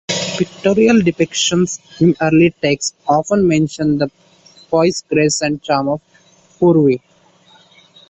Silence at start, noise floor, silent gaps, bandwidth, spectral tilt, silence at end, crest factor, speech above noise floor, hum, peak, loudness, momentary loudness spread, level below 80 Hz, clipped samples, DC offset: 0.1 s; -51 dBFS; none; 8.4 kHz; -5 dB/octave; 1.15 s; 14 dB; 36 dB; none; -2 dBFS; -15 LUFS; 7 LU; -50 dBFS; under 0.1%; under 0.1%